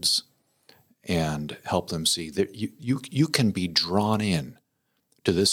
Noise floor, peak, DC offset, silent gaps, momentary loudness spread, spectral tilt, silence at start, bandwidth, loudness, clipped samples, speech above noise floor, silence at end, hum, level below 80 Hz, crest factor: -74 dBFS; -6 dBFS; under 0.1%; none; 7 LU; -4 dB/octave; 0 s; 18.5 kHz; -26 LUFS; under 0.1%; 49 dB; 0 s; none; -58 dBFS; 20 dB